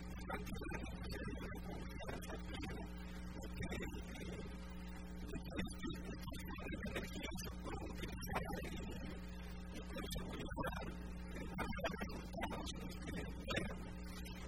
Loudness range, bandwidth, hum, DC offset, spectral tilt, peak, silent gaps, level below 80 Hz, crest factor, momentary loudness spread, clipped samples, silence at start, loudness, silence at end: 3 LU; 16 kHz; none; 0.1%; -5 dB/octave; -26 dBFS; none; -52 dBFS; 20 dB; 7 LU; under 0.1%; 0 s; -47 LUFS; 0 s